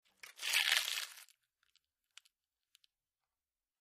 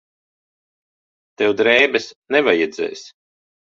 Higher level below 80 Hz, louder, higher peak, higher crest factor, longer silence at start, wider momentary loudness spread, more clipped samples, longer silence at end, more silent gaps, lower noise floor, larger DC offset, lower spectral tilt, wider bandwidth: second, under -90 dBFS vs -64 dBFS; second, -34 LUFS vs -17 LUFS; second, -14 dBFS vs -2 dBFS; first, 28 dB vs 20 dB; second, 0.25 s vs 1.4 s; first, 17 LU vs 13 LU; neither; first, 2.6 s vs 0.7 s; second, none vs 2.16-2.22 s; about the same, under -90 dBFS vs under -90 dBFS; neither; second, 5 dB/octave vs -3.5 dB/octave; first, 15.5 kHz vs 7.6 kHz